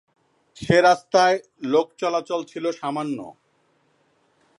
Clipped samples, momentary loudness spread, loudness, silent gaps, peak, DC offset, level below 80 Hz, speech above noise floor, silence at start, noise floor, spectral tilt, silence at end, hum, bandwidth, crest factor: under 0.1%; 14 LU; -21 LUFS; none; -4 dBFS; under 0.1%; -60 dBFS; 44 dB; 0.6 s; -65 dBFS; -5 dB/octave; 1.3 s; none; 11 kHz; 20 dB